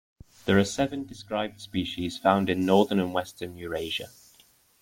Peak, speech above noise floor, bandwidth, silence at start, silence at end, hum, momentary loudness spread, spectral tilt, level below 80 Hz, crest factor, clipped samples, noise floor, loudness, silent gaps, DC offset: -6 dBFS; 34 dB; 16.5 kHz; 0.45 s; 0.75 s; none; 14 LU; -5.5 dB/octave; -58 dBFS; 22 dB; under 0.1%; -60 dBFS; -27 LUFS; none; under 0.1%